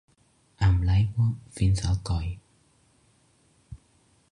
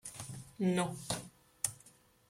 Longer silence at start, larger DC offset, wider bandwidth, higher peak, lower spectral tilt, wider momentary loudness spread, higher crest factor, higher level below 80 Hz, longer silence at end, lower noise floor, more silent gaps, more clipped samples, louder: first, 0.6 s vs 0.05 s; neither; second, 11 kHz vs 16 kHz; about the same, -12 dBFS vs -14 dBFS; first, -6.5 dB/octave vs -4.5 dB/octave; second, 8 LU vs 17 LU; second, 16 dB vs 26 dB; first, -36 dBFS vs -68 dBFS; first, 0.55 s vs 0.4 s; about the same, -64 dBFS vs -64 dBFS; neither; neither; first, -26 LUFS vs -38 LUFS